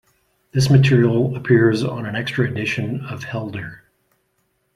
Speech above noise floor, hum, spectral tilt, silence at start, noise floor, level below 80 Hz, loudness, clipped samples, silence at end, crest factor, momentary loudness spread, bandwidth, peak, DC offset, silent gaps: 50 dB; none; -7 dB/octave; 0.55 s; -68 dBFS; -50 dBFS; -19 LUFS; under 0.1%; 1 s; 18 dB; 14 LU; 12 kHz; -2 dBFS; under 0.1%; none